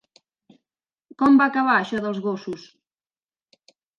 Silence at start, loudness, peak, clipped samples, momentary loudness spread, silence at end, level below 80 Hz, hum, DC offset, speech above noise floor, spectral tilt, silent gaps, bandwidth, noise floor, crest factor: 1.2 s; -20 LUFS; -6 dBFS; under 0.1%; 16 LU; 1.4 s; -66 dBFS; none; under 0.1%; over 70 dB; -6.5 dB/octave; none; 7 kHz; under -90 dBFS; 18 dB